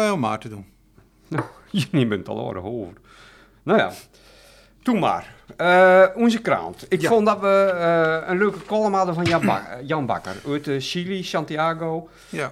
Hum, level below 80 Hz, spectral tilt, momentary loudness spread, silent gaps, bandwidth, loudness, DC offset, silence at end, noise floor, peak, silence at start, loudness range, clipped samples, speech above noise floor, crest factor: none; -58 dBFS; -6 dB/octave; 13 LU; none; 14.5 kHz; -21 LUFS; under 0.1%; 0 s; -55 dBFS; -4 dBFS; 0 s; 8 LU; under 0.1%; 34 dB; 18 dB